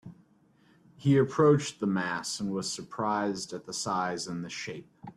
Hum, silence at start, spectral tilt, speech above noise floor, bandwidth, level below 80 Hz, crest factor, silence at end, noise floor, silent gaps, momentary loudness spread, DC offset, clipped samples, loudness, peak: none; 0.05 s; -5 dB/octave; 35 dB; 13 kHz; -68 dBFS; 20 dB; 0.05 s; -64 dBFS; none; 13 LU; under 0.1%; under 0.1%; -29 LUFS; -10 dBFS